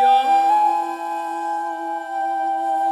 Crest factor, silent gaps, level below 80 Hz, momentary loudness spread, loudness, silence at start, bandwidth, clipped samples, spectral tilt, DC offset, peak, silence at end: 12 dB; none; -74 dBFS; 10 LU; -20 LUFS; 0 s; 13 kHz; under 0.1%; -1 dB/octave; under 0.1%; -6 dBFS; 0 s